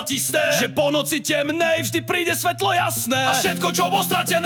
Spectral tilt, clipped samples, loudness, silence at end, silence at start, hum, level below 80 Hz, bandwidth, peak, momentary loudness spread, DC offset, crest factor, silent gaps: -3 dB/octave; under 0.1%; -20 LUFS; 0 s; 0 s; none; -62 dBFS; 18 kHz; -6 dBFS; 3 LU; under 0.1%; 14 dB; none